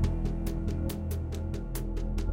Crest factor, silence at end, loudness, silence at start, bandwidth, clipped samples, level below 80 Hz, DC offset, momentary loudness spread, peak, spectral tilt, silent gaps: 14 dB; 0 s; -34 LUFS; 0 s; 17 kHz; under 0.1%; -34 dBFS; under 0.1%; 3 LU; -16 dBFS; -7 dB/octave; none